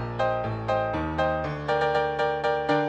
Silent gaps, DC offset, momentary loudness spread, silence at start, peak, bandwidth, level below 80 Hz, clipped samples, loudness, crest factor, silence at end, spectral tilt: none; under 0.1%; 3 LU; 0 s; -10 dBFS; 9.2 kHz; -44 dBFS; under 0.1%; -26 LUFS; 16 dB; 0 s; -7 dB/octave